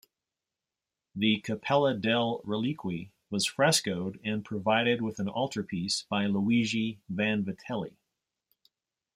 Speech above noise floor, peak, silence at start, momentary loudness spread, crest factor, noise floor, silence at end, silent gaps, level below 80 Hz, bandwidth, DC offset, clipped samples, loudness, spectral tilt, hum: 60 dB; -10 dBFS; 1.15 s; 10 LU; 20 dB; -90 dBFS; 1.25 s; none; -70 dBFS; 16 kHz; under 0.1%; under 0.1%; -29 LUFS; -4.5 dB/octave; none